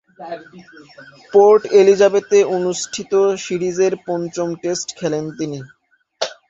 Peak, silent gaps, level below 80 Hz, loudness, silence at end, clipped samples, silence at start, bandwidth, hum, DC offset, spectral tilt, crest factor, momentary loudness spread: -2 dBFS; none; -62 dBFS; -17 LUFS; 0.15 s; under 0.1%; 0.2 s; 7.8 kHz; none; under 0.1%; -4.5 dB/octave; 16 dB; 15 LU